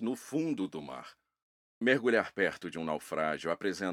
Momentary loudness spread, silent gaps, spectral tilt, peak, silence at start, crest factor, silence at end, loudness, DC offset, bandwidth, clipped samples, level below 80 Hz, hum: 11 LU; 1.43-1.81 s; -5 dB/octave; -12 dBFS; 0 s; 22 dB; 0 s; -32 LUFS; under 0.1%; 16 kHz; under 0.1%; -74 dBFS; none